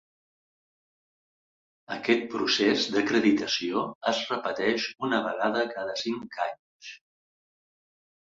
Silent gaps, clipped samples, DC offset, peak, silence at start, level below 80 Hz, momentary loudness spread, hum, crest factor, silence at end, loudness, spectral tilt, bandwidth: 3.95-4.01 s, 6.59-6.80 s; under 0.1%; under 0.1%; -8 dBFS; 1.9 s; -70 dBFS; 10 LU; none; 22 dB; 1.4 s; -27 LUFS; -3.5 dB/octave; 7.8 kHz